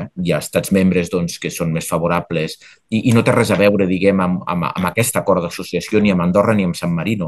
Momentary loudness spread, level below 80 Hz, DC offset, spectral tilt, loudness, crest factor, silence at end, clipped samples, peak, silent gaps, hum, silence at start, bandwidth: 8 LU; -48 dBFS; under 0.1%; -6 dB/octave; -17 LUFS; 16 dB; 0 s; under 0.1%; 0 dBFS; none; none; 0 s; 13 kHz